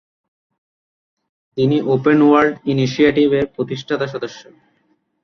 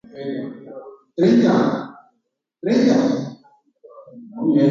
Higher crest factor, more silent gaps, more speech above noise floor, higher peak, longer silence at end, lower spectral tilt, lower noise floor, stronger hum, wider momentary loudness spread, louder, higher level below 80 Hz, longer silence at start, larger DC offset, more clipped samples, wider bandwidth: about the same, 16 dB vs 16 dB; neither; second, 47 dB vs 55 dB; about the same, -2 dBFS vs -4 dBFS; first, 0.8 s vs 0 s; about the same, -7 dB/octave vs -7 dB/octave; second, -63 dBFS vs -73 dBFS; neither; second, 12 LU vs 22 LU; first, -16 LUFS vs -19 LUFS; first, -54 dBFS vs -64 dBFS; first, 1.55 s vs 0.15 s; neither; neither; second, 6.6 kHz vs 7.4 kHz